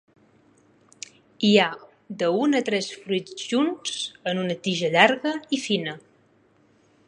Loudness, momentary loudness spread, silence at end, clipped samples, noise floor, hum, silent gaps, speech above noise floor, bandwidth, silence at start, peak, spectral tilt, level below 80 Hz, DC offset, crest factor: -23 LUFS; 23 LU; 1.1 s; under 0.1%; -61 dBFS; none; none; 37 dB; 10.5 kHz; 1.4 s; 0 dBFS; -4 dB/octave; -74 dBFS; under 0.1%; 24 dB